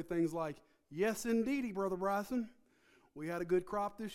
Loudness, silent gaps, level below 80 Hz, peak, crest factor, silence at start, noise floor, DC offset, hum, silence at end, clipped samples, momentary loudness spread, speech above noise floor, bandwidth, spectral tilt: -37 LUFS; none; -66 dBFS; -22 dBFS; 14 dB; 0 s; -69 dBFS; under 0.1%; none; 0 s; under 0.1%; 13 LU; 32 dB; 16 kHz; -6 dB/octave